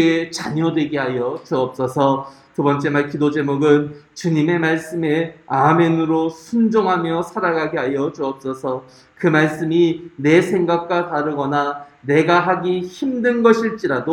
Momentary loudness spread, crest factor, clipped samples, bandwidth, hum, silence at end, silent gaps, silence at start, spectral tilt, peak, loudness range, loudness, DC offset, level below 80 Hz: 9 LU; 18 dB; under 0.1%; 12.5 kHz; none; 0 s; none; 0 s; -6.5 dB/octave; 0 dBFS; 2 LU; -18 LUFS; under 0.1%; -60 dBFS